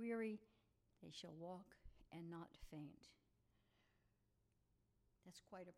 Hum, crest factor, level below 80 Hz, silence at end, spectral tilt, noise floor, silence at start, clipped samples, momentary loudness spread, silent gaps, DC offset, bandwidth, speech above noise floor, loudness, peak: none; 18 dB; -74 dBFS; 0 s; -6 dB/octave; -83 dBFS; 0 s; under 0.1%; 17 LU; none; under 0.1%; 14.5 kHz; 26 dB; -55 LUFS; -38 dBFS